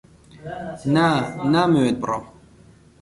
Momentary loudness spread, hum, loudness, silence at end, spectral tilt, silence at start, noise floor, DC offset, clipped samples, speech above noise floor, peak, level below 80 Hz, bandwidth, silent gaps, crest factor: 16 LU; none; -20 LUFS; 0.7 s; -6.5 dB/octave; 0.35 s; -50 dBFS; under 0.1%; under 0.1%; 30 dB; -6 dBFS; -54 dBFS; 11.5 kHz; none; 16 dB